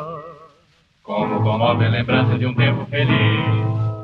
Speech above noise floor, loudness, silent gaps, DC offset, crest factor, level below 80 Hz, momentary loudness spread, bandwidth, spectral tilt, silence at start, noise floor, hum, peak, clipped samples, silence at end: 40 dB; -18 LUFS; none; under 0.1%; 14 dB; -48 dBFS; 7 LU; 4.5 kHz; -9 dB/octave; 0 s; -57 dBFS; none; -4 dBFS; under 0.1%; 0 s